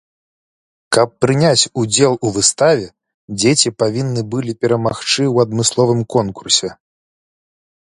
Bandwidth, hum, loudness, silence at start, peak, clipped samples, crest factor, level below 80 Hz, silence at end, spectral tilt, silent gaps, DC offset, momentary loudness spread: 11.5 kHz; none; -15 LUFS; 0.9 s; 0 dBFS; under 0.1%; 16 dB; -52 dBFS; 1.2 s; -4 dB/octave; 3.14-3.28 s; under 0.1%; 7 LU